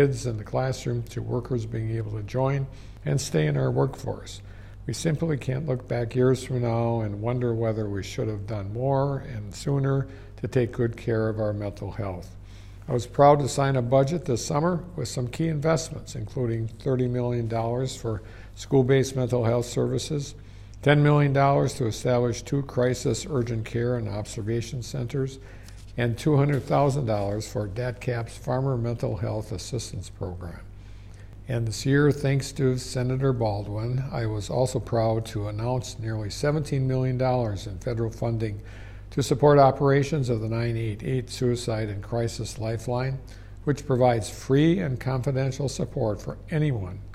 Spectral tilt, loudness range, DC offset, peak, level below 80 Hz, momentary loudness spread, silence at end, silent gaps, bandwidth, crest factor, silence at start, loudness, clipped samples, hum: -6.5 dB/octave; 5 LU; under 0.1%; -6 dBFS; -46 dBFS; 13 LU; 0 s; none; 13.5 kHz; 20 dB; 0 s; -26 LUFS; under 0.1%; none